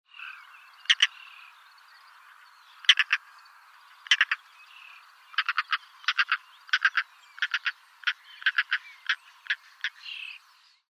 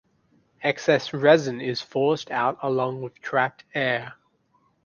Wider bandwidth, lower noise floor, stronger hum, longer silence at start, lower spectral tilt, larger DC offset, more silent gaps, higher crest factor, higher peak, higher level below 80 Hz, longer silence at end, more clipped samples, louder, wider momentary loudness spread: first, 16 kHz vs 7.2 kHz; second, -60 dBFS vs -66 dBFS; neither; second, 0.2 s vs 0.6 s; second, 10.5 dB/octave vs -5.5 dB/octave; neither; neither; first, 28 dB vs 22 dB; about the same, -2 dBFS vs -2 dBFS; second, under -90 dBFS vs -68 dBFS; second, 0.55 s vs 0.7 s; neither; second, -27 LUFS vs -24 LUFS; first, 20 LU vs 10 LU